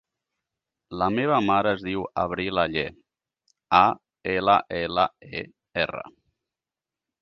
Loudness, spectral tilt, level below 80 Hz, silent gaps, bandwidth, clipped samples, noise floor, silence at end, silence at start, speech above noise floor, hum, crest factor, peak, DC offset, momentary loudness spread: -24 LUFS; -7 dB/octave; -54 dBFS; none; 6.8 kHz; under 0.1%; -90 dBFS; 1.1 s; 0.9 s; 66 dB; none; 22 dB; -4 dBFS; under 0.1%; 15 LU